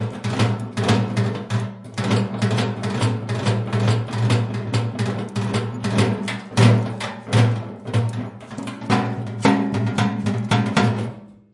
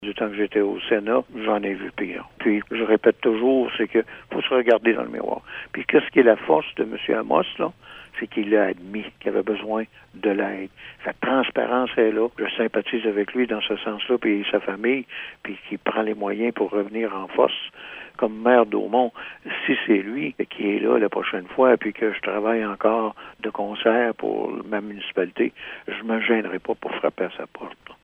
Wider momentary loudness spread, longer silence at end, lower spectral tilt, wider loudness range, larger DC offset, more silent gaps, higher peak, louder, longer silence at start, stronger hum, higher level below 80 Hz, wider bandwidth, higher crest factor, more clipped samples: second, 9 LU vs 13 LU; about the same, 0.2 s vs 0.1 s; about the same, -6.5 dB/octave vs -7.5 dB/octave; about the same, 2 LU vs 4 LU; neither; neither; about the same, -2 dBFS vs 0 dBFS; about the same, -22 LUFS vs -23 LUFS; about the same, 0 s vs 0 s; neither; first, -56 dBFS vs -62 dBFS; first, 11.5 kHz vs 4.4 kHz; about the same, 18 dB vs 22 dB; neither